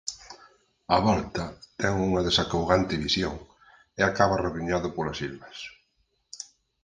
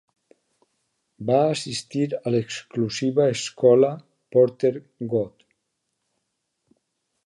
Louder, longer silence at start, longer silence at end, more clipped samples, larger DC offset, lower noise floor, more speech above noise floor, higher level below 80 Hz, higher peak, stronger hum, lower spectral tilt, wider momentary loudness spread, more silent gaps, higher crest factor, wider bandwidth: second, -26 LUFS vs -22 LUFS; second, 0.05 s vs 1.2 s; second, 0.4 s vs 1.95 s; neither; neither; second, -72 dBFS vs -77 dBFS; second, 46 dB vs 56 dB; first, -46 dBFS vs -68 dBFS; about the same, -4 dBFS vs -4 dBFS; neither; about the same, -4.5 dB/octave vs -5.5 dB/octave; first, 20 LU vs 12 LU; neither; about the same, 24 dB vs 20 dB; second, 9.8 kHz vs 11.5 kHz